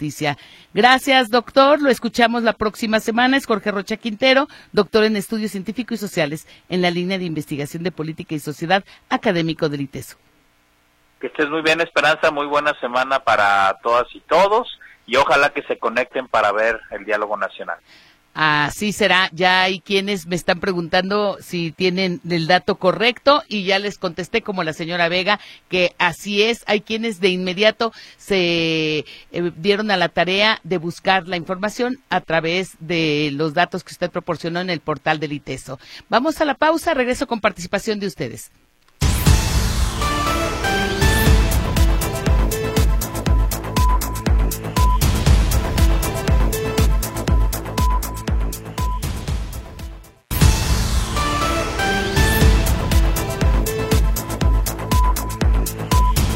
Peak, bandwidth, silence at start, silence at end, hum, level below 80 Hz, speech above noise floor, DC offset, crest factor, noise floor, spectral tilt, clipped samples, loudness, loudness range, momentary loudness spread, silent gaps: 0 dBFS; 16.5 kHz; 0 s; 0 s; none; -24 dBFS; 39 dB; under 0.1%; 18 dB; -59 dBFS; -4.5 dB/octave; under 0.1%; -19 LUFS; 5 LU; 10 LU; none